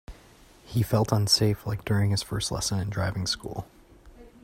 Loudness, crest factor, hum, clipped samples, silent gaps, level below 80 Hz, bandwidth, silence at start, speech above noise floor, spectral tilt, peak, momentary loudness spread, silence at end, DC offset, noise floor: -26 LUFS; 20 dB; none; under 0.1%; none; -48 dBFS; 16 kHz; 0.1 s; 28 dB; -4.5 dB/octave; -8 dBFS; 10 LU; 0.15 s; under 0.1%; -54 dBFS